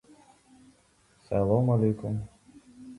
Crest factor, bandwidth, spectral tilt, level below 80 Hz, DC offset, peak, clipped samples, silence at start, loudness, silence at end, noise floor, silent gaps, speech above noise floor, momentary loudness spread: 20 dB; 11 kHz; -10.5 dB/octave; -54 dBFS; under 0.1%; -10 dBFS; under 0.1%; 1.3 s; -27 LUFS; 0 s; -64 dBFS; none; 38 dB; 19 LU